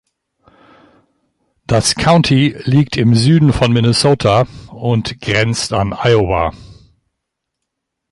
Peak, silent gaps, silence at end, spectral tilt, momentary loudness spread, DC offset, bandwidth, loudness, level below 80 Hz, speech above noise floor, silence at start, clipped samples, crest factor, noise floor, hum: 0 dBFS; none; 1.4 s; -5.5 dB/octave; 7 LU; under 0.1%; 11.5 kHz; -13 LUFS; -36 dBFS; 63 dB; 1.7 s; under 0.1%; 14 dB; -76 dBFS; none